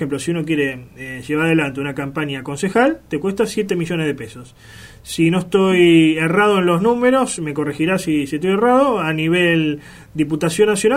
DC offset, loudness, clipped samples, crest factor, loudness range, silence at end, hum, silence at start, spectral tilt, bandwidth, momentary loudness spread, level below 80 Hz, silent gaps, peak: under 0.1%; -17 LUFS; under 0.1%; 16 dB; 5 LU; 0 s; none; 0 s; -5.5 dB/octave; 15.5 kHz; 10 LU; -50 dBFS; none; -2 dBFS